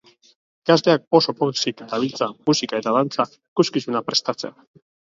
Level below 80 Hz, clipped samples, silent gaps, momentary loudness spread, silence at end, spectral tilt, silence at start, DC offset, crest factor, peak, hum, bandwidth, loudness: -68 dBFS; under 0.1%; 1.07-1.11 s, 3.48-3.56 s; 8 LU; 0.65 s; -4.5 dB/octave; 0.65 s; under 0.1%; 22 dB; 0 dBFS; none; 7.8 kHz; -21 LUFS